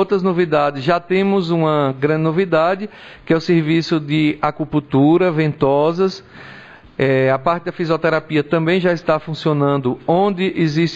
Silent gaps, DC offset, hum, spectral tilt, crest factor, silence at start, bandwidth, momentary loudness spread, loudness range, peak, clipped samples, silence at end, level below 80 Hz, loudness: none; 0.1%; none; -7.5 dB/octave; 14 dB; 0 s; 7.8 kHz; 6 LU; 2 LU; -2 dBFS; under 0.1%; 0 s; -52 dBFS; -17 LUFS